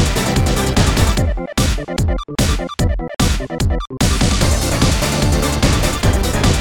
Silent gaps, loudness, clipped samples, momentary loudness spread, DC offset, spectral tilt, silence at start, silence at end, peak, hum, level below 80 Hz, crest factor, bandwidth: none; -17 LUFS; under 0.1%; 5 LU; under 0.1%; -4.5 dB/octave; 0 s; 0 s; 0 dBFS; none; -20 dBFS; 14 dB; 18 kHz